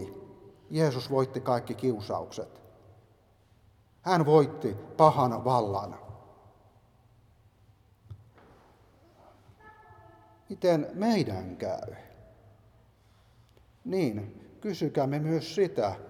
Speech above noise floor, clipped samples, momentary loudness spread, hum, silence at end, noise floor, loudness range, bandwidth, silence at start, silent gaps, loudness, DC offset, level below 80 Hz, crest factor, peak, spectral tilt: 35 dB; under 0.1%; 22 LU; none; 0 s; -63 dBFS; 10 LU; 16 kHz; 0 s; none; -28 LUFS; under 0.1%; -66 dBFS; 26 dB; -6 dBFS; -7 dB/octave